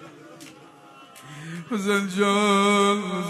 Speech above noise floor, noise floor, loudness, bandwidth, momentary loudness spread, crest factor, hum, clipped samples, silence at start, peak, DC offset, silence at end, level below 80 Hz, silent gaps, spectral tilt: 26 dB; -48 dBFS; -21 LUFS; 13.5 kHz; 24 LU; 16 dB; none; under 0.1%; 0 s; -8 dBFS; under 0.1%; 0 s; -72 dBFS; none; -4.5 dB/octave